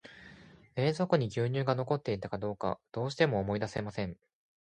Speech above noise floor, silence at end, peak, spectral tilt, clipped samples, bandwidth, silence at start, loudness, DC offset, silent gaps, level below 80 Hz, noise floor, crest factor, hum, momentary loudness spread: 24 dB; 0.55 s; -10 dBFS; -7 dB/octave; under 0.1%; 9.8 kHz; 0.05 s; -33 LUFS; under 0.1%; none; -60 dBFS; -55 dBFS; 22 dB; none; 10 LU